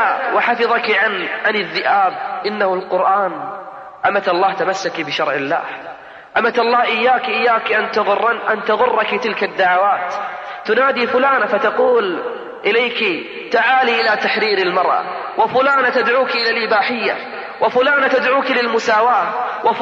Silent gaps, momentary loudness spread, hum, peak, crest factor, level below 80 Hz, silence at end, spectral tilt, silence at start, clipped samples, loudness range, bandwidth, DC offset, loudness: none; 8 LU; none; -4 dBFS; 12 dB; -64 dBFS; 0 s; -4 dB/octave; 0 s; under 0.1%; 3 LU; 7.8 kHz; under 0.1%; -16 LUFS